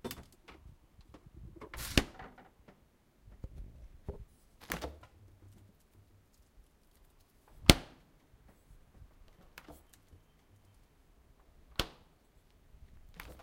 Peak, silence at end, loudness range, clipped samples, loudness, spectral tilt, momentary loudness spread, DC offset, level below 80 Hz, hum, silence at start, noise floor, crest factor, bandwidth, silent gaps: 0 dBFS; 0.1 s; 15 LU; under 0.1%; -33 LUFS; -3.5 dB/octave; 32 LU; under 0.1%; -48 dBFS; none; 0.05 s; -67 dBFS; 40 dB; 16 kHz; none